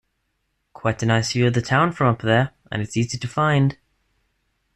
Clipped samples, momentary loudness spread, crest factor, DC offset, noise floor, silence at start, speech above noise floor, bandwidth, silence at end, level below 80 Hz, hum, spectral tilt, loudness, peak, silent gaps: under 0.1%; 8 LU; 16 dB; under 0.1%; -72 dBFS; 0.85 s; 53 dB; 11.5 kHz; 1 s; -52 dBFS; none; -6 dB/octave; -21 LUFS; -6 dBFS; none